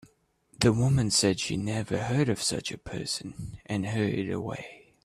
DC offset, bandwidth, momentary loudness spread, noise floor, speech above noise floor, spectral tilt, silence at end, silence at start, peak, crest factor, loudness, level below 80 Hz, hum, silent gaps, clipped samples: under 0.1%; 13.5 kHz; 13 LU; -64 dBFS; 36 dB; -4.5 dB/octave; 0.25 s; 0.6 s; -6 dBFS; 22 dB; -28 LUFS; -54 dBFS; none; none; under 0.1%